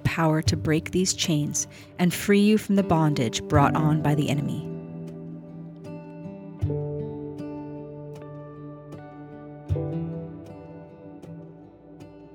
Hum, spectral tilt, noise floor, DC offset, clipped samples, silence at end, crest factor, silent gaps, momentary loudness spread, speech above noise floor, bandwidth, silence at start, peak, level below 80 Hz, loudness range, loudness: none; -5.5 dB/octave; -47 dBFS; under 0.1%; under 0.1%; 0 s; 22 dB; none; 21 LU; 24 dB; 18.5 kHz; 0 s; -6 dBFS; -52 dBFS; 13 LU; -25 LUFS